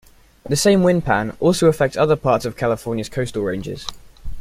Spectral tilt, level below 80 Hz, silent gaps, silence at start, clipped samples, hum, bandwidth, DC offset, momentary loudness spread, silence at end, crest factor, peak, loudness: -5.5 dB/octave; -40 dBFS; none; 0.45 s; under 0.1%; none; 16 kHz; under 0.1%; 10 LU; 0 s; 16 dB; -2 dBFS; -18 LUFS